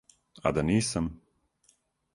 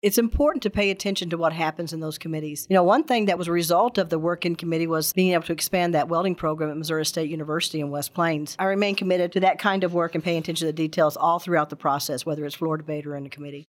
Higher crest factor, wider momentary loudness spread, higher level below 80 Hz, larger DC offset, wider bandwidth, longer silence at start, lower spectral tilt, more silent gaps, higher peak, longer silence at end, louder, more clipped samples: about the same, 22 dB vs 18 dB; about the same, 7 LU vs 8 LU; about the same, -50 dBFS vs -46 dBFS; neither; second, 11.5 kHz vs 17 kHz; first, 0.45 s vs 0.05 s; about the same, -5.5 dB/octave vs -4.5 dB/octave; neither; second, -10 dBFS vs -6 dBFS; first, 1 s vs 0.05 s; second, -29 LUFS vs -24 LUFS; neither